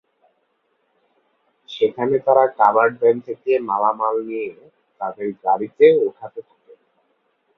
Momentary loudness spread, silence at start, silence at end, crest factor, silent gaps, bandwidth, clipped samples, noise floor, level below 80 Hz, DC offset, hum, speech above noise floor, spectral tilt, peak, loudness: 16 LU; 1.7 s; 1.15 s; 20 dB; none; 5.6 kHz; under 0.1%; -68 dBFS; -70 dBFS; under 0.1%; none; 50 dB; -7.5 dB/octave; 0 dBFS; -18 LUFS